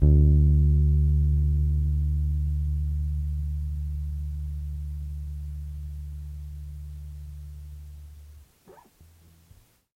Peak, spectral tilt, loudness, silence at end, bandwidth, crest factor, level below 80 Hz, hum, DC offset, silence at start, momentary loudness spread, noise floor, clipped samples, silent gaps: -6 dBFS; -10.5 dB/octave; -26 LUFS; 1.25 s; 1 kHz; 18 dB; -28 dBFS; none; under 0.1%; 0 s; 21 LU; -57 dBFS; under 0.1%; none